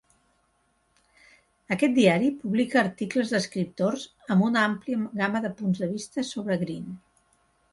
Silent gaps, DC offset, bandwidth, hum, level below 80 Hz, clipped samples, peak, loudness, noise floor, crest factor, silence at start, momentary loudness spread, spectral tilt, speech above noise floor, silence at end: none; under 0.1%; 11.5 kHz; none; -66 dBFS; under 0.1%; -6 dBFS; -26 LUFS; -69 dBFS; 20 dB; 1.7 s; 11 LU; -6 dB/octave; 44 dB; 0.75 s